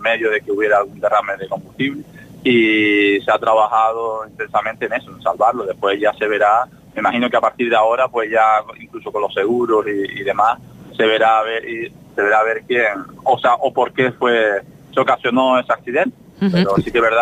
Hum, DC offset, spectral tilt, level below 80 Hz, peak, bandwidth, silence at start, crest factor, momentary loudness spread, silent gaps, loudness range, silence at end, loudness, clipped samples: none; under 0.1%; -6 dB/octave; -54 dBFS; -2 dBFS; 15 kHz; 0 s; 14 dB; 9 LU; none; 2 LU; 0 s; -17 LUFS; under 0.1%